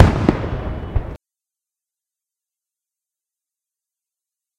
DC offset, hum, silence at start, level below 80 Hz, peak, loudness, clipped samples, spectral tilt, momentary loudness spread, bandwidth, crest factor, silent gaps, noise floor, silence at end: under 0.1%; none; 0 s; -32 dBFS; 0 dBFS; -21 LUFS; under 0.1%; -8 dB/octave; 18 LU; 9.6 kHz; 22 dB; none; -87 dBFS; 3.4 s